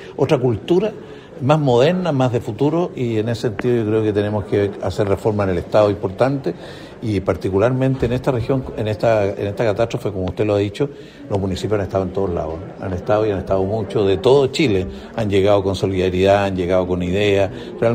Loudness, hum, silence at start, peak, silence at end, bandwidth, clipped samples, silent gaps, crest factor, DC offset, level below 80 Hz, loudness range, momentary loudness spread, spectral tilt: -19 LUFS; none; 0 s; -2 dBFS; 0 s; 15 kHz; under 0.1%; none; 16 dB; under 0.1%; -44 dBFS; 4 LU; 10 LU; -7 dB/octave